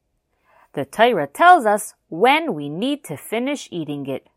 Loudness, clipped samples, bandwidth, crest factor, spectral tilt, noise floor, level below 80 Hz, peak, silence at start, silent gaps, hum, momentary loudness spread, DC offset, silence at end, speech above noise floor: -19 LUFS; under 0.1%; 15.5 kHz; 20 dB; -4 dB/octave; -66 dBFS; -68 dBFS; 0 dBFS; 0.75 s; none; none; 15 LU; under 0.1%; 0.2 s; 47 dB